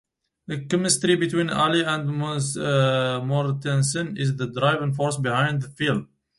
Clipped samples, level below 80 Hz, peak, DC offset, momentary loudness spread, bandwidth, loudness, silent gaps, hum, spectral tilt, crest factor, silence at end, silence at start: under 0.1%; -60 dBFS; -6 dBFS; under 0.1%; 6 LU; 11.5 kHz; -23 LUFS; none; none; -4.5 dB/octave; 18 dB; 0.35 s; 0.5 s